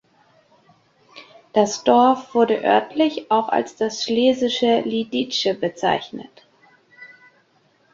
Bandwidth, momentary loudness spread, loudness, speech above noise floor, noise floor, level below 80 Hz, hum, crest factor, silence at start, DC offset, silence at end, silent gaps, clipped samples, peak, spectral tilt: 7.6 kHz; 7 LU; -19 LUFS; 41 dB; -60 dBFS; -66 dBFS; none; 20 dB; 1.15 s; under 0.1%; 0.85 s; none; under 0.1%; -2 dBFS; -4 dB/octave